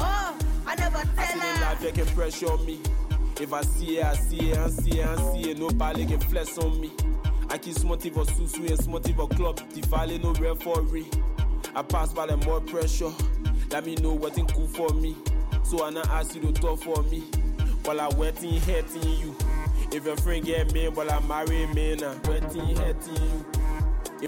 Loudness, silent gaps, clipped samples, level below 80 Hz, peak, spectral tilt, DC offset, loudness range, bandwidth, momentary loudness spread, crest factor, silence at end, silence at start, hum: -28 LUFS; none; under 0.1%; -26 dBFS; -16 dBFS; -5.5 dB/octave; under 0.1%; 1 LU; 17 kHz; 3 LU; 10 dB; 0 s; 0 s; none